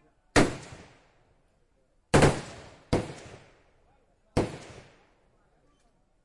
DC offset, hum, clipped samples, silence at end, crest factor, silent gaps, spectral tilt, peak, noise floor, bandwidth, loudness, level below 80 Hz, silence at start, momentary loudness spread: under 0.1%; none; under 0.1%; 1.6 s; 24 dB; none; -5 dB/octave; -8 dBFS; -68 dBFS; 11.5 kHz; -27 LUFS; -46 dBFS; 0.35 s; 26 LU